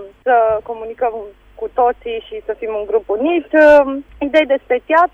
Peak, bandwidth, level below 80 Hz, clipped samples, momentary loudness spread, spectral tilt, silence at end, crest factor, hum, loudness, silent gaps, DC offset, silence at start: -2 dBFS; 7 kHz; -46 dBFS; under 0.1%; 16 LU; -5.5 dB/octave; 0.05 s; 14 dB; none; -15 LUFS; none; under 0.1%; 0 s